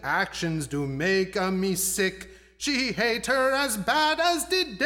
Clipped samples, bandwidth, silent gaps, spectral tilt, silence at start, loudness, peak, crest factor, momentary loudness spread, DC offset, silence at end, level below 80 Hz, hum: under 0.1%; 18 kHz; none; -3 dB/octave; 0 s; -25 LUFS; -10 dBFS; 16 dB; 7 LU; under 0.1%; 0 s; -52 dBFS; none